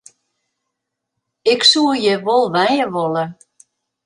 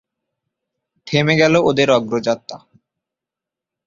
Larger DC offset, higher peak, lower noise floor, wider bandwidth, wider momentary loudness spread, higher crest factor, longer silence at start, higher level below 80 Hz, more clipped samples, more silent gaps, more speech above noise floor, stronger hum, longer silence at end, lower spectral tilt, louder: neither; about the same, 0 dBFS vs 0 dBFS; second, -78 dBFS vs -86 dBFS; first, 11.5 kHz vs 7.6 kHz; about the same, 10 LU vs 10 LU; about the same, 18 dB vs 18 dB; first, 1.45 s vs 1.05 s; second, -66 dBFS vs -54 dBFS; neither; neither; second, 63 dB vs 70 dB; neither; second, 0.7 s vs 1.3 s; second, -3.5 dB/octave vs -5.5 dB/octave; about the same, -15 LUFS vs -16 LUFS